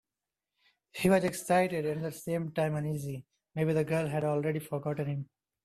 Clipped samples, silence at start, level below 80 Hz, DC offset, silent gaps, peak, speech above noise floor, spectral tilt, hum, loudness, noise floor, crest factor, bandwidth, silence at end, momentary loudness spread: under 0.1%; 0.95 s; -68 dBFS; under 0.1%; none; -12 dBFS; over 60 dB; -6.5 dB/octave; none; -31 LUFS; under -90 dBFS; 20 dB; 14 kHz; 0.4 s; 13 LU